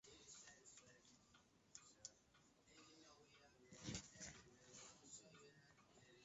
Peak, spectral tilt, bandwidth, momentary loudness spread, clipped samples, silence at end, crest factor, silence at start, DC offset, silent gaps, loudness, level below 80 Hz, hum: -36 dBFS; -3.5 dB/octave; 8 kHz; 14 LU; under 0.1%; 0 s; 28 dB; 0.05 s; under 0.1%; none; -61 LUFS; -80 dBFS; none